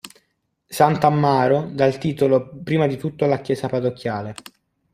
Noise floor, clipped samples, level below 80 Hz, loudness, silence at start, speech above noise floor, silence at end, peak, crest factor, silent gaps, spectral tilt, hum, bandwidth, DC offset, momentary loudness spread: -70 dBFS; under 0.1%; -58 dBFS; -20 LUFS; 0.05 s; 51 dB; 0.6 s; 0 dBFS; 20 dB; none; -7 dB/octave; none; 15.5 kHz; under 0.1%; 11 LU